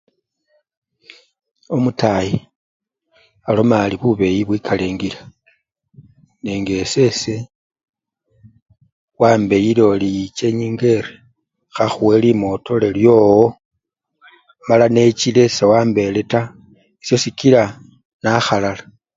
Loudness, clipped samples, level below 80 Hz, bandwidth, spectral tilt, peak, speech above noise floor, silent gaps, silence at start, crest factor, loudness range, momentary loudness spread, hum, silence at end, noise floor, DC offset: -16 LUFS; under 0.1%; -48 dBFS; 7.8 kHz; -6 dB/octave; 0 dBFS; 57 dB; 2.56-2.80 s, 7.55-7.70 s, 7.89-7.93 s, 8.62-8.66 s, 8.92-9.08 s, 13.65-13.71 s, 18.05-18.20 s; 1.7 s; 18 dB; 8 LU; 13 LU; none; 0.35 s; -72 dBFS; under 0.1%